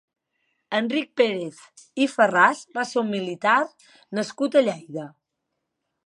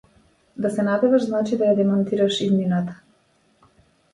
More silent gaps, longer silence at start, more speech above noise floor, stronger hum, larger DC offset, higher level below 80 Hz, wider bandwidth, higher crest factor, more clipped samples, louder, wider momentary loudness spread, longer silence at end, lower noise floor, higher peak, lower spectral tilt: neither; about the same, 0.7 s vs 0.6 s; first, 57 dB vs 42 dB; neither; neither; second, -80 dBFS vs -64 dBFS; about the same, 11.5 kHz vs 11.5 kHz; first, 22 dB vs 16 dB; neither; about the same, -23 LUFS vs -21 LUFS; first, 16 LU vs 8 LU; second, 1 s vs 1.2 s; first, -80 dBFS vs -62 dBFS; about the same, -4 dBFS vs -6 dBFS; second, -4.5 dB/octave vs -7 dB/octave